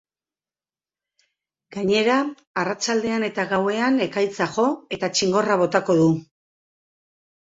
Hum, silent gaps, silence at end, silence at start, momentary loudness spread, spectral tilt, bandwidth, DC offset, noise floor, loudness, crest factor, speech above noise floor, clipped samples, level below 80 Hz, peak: none; 2.47-2.54 s; 1.25 s; 1.7 s; 8 LU; -4.5 dB/octave; 8 kHz; under 0.1%; under -90 dBFS; -21 LUFS; 20 dB; over 69 dB; under 0.1%; -64 dBFS; -4 dBFS